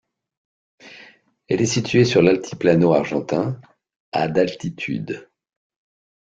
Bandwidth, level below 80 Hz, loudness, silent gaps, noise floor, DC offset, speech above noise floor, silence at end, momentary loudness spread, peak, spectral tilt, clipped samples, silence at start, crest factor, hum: 9 kHz; -56 dBFS; -20 LUFS; 3.96-4.12 s; -50 dBFS; under 0.1%; 31 dB; 0.95 s; 12 LU; -2 dBFS; -6 dB/octave; under 0.1%; 0.85 s; 18 dB; none